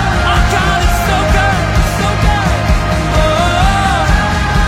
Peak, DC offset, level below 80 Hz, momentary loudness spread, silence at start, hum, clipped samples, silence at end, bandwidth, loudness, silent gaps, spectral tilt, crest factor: 0 dBFS; under 0.1%; -16 dBFS; 2 LU; 0 s; none; under 0.1%; 0 s; 16.5 kHz; -12 LUFS; none; -5 dB/octave; 12 dB